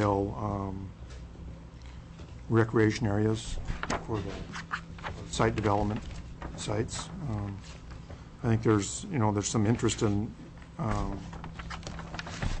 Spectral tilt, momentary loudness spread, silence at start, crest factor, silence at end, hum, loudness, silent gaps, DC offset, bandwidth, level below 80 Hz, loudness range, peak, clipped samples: -5.5 dB/octave; 19 LU; 0 s; 18 dB; 0 s; none; -31 LUFS; none; under 0.1%; 8.6 kHz; -44 dBFS; 3 LU; -12 dBFS; under 0.1%